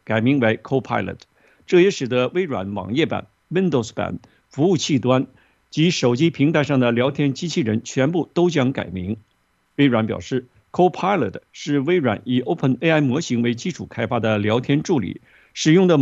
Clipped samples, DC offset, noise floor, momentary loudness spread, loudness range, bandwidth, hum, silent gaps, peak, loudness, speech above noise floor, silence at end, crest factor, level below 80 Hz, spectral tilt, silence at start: under 0.1%; under 0.1%; -65 dBFS; 11 LU; 2 LU; 8 kHz; none; none; -2 dBFS; -20 LUFS; 45 dB; 0 s; 18 dB; -60 dBFS; -6 dB/octave; 0.1 s